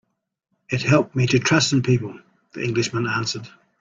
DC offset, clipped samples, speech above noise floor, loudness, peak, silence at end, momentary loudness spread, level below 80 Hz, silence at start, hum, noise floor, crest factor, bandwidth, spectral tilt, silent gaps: under 0.1%; under 0.1%; 55 dB; -21 LUFS; -4 dBFS; 0.35 s; 12 LU; -54 dBFS; 0.7 s; none; -75 dBFS; 18 dB; 7.6 kHz; -5 dB/octave; none